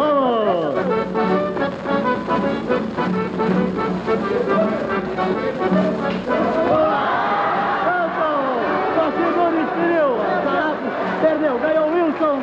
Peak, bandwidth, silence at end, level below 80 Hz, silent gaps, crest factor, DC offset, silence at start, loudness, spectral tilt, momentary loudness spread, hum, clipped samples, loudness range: -6 dBFS; 8 kHz; 0 s; -50 dBFS; none; 14 dB; under 0.1%; 0 s; -19 LUFS; -7.5 dB/octave; 4 LU; none; under 0.1%; 2 LU